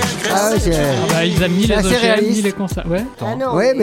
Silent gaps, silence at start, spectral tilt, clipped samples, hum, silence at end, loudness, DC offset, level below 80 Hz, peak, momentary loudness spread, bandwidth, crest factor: none; 0 s; -4.5 dB/octave; under 0.1%; none; 0 s; -16 LUFS; under 0.1%; -30 dBFS; 0 dBFS; 8 LU; 17 kHz; 16 dB